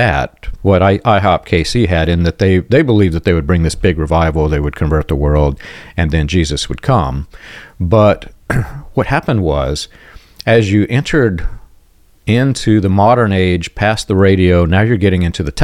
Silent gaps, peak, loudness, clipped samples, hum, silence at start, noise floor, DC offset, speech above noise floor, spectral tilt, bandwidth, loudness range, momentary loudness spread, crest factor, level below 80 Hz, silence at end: none; 0 dBFS; -13 LUFS; under 0.1%; none; 0 s; -47 dBFS; under 0.1%; 34 dB; -6.5 dB/octave; 13 kHz; 4 LU; 10 LU; 12 dB; -26 dBFS; 0 s